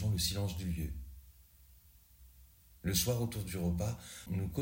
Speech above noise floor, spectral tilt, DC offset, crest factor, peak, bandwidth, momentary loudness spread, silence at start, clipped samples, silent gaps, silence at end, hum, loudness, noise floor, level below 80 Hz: 26 dB; -4.5 dB/octave; under 0.1%; 20 dB; -18 dBFS; 16.5 kHz; 14 LU; 0 s; under 0.1%; none; 0 s; none; -36 LUFS; -62 dBFS; -50 dBFS